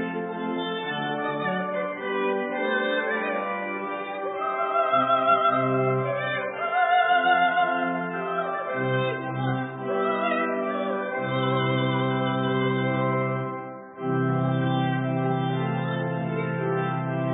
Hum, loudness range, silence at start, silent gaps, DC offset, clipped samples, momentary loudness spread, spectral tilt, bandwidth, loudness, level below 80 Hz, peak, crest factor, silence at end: none; 4 LU; 0 s; none; under 0.1%; under 0.1%; 8 LU; -11 dB/octave; 4 kHz; -25 LUFS; -68 dBFS; -10 dBFS; 16 dB; 0 s